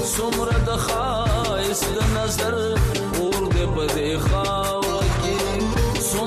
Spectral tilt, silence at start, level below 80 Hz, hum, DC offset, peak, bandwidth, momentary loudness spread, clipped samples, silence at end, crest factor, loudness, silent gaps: -4.5 dB/octave; 0 s; -28 dBFS; none; under 0.1%; -8 dBFS; 15 kHz; 1 LU; under 0.1%; 0 s; 12 dB; -22 LUFS; none